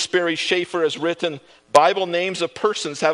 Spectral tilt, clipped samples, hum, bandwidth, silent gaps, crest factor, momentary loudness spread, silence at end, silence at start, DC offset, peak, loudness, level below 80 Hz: -3 dB/octave; under 0.1%; none; 10.5 kHz; none; 20 dB; 8 LU; 0 s; 0 s; under 0.1%; 0 dBFS; -20 LUFS; -68 dBFS